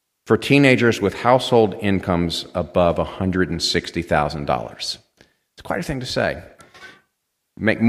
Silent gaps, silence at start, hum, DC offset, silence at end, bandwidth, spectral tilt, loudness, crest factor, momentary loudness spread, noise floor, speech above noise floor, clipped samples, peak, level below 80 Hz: none; 0.25 s; none; under 0.1%; 0 s; 14.5 kHz; -5.5 dB/octave; -20 LUFS; 20 dB; 12 LU; -74 dBFS; 55 dB; under 0.1%; 0 dBFS; -44 dBFS